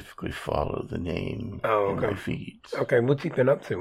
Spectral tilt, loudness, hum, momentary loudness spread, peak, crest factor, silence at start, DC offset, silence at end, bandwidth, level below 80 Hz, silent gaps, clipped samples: -7.5 dB/octave; -27 LUFS; none; 10 LU; -10 dBFS; 18 dB; 0 s; under 0.1%; 0 s; 14.5 kHz; -48 dBFS; none; under 0.1%